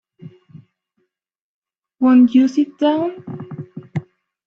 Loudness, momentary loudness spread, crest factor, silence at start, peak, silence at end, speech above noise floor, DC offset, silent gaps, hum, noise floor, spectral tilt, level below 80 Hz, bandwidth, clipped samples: -16 LUFS; 21 LU; 16 dB; 0.25 s; -4 dBFS; 0.45 s; 61 dB; under 0.1%; 1.41-1.62 s; none; -75 dBFS; -7.5 dB/octave; -70 dBFS; 6.8 kHz; under 0.1%